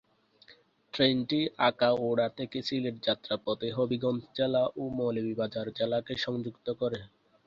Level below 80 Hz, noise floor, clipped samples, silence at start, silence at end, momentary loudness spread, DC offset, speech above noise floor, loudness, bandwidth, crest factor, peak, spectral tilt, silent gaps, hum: -66 dBFS; -61 dBFS; under 0.1%; 0.5 s; 0.4 s; 8 LU; under 0.1%; 30 dB; -30 LUFS; 7.2 kHz; 20 dB; -10 dBFS; -6.5 dB/octave; none; none